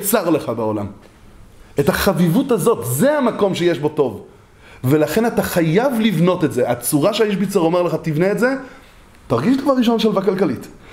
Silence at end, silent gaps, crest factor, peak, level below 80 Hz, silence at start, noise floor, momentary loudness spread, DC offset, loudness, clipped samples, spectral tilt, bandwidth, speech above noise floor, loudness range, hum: 0 s; none; 16 dB; -2 dBFS; -46 dBFS; 0 s; -44 dBFS; 6 LU; under 0.1%; -17 LUFS; under 0.1%; -5.5 dB/octave; 16.5 kHz; 27 dB; 2 LU; none